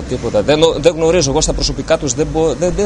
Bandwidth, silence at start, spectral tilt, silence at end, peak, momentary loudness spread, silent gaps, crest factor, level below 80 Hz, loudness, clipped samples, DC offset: 11 kHz; 0 s; -4 dB/octave; 0 s; 0 dBFS; 5 LU; none; 14 dB; -26 dBFS; -14 LUFS; under 0.1%; under 0.1%